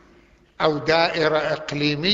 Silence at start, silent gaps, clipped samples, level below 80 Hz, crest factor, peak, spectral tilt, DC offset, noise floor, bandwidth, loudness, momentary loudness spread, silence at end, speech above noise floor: 0.6 s; none; under 0.1%; -54 dBFS; 18 dB; -4 dBFS; -5 dB/octave; under 0.1%; -54 dBFS; 7.8 kHz; -21 LUFS; 5 LU; 0 s; 33 dB